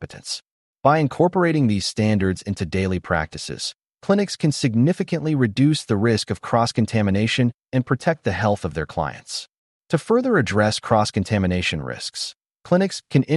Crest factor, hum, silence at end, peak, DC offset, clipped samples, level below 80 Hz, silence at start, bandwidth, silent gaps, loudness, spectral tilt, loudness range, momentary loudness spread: 18 dB; none; 0 s; -2 dBFS; under 0.1%; under 0.1%; -48 dBFS; 0 s; 11.5 kHz; 0.51-0.75 s, 7.54-7.59 s, 9.58-9.81 s, 12.36-12.41 s; -21 LUFS; -6 dB/octave; 2 LU; 10 LU